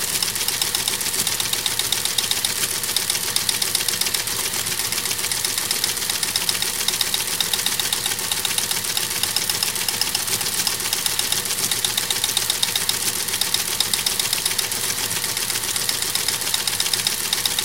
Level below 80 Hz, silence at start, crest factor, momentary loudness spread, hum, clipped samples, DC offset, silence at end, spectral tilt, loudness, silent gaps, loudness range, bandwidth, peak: -52 dBFS; 0 s; 22 dB; 2 LU; none; under 0.1%; 0.5%; 0 s; 0.5 dB/octave; -20 LUFS; none; 1 LU; 17.5 kHz; -2 dBFS